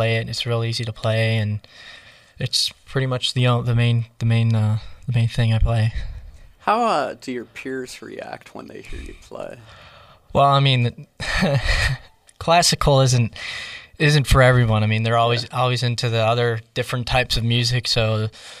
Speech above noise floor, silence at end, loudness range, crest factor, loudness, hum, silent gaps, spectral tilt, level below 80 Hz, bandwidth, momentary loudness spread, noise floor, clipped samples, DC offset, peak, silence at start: 20 dB; 0 s; 8 LU; 18 dB; -20 LUFS; none; none; -5 dB/octave; -34 dBFS; 14 kHz; 18 LU; -39 dBFS; under 0.1%; under 0.1%; -4 dBFS; 0 s